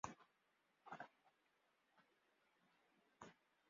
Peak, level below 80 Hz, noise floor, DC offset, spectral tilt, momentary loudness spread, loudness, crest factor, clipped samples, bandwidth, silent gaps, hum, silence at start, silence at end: -30 dBFS; -86 dBFS; -84 dBFS; under 0.1%; -3.5 dB/octave; 8 LU; -61 LUFS; 34 dB; under 0.1%; 7.2 kHz; none; none; 0.05 s; 0.35 s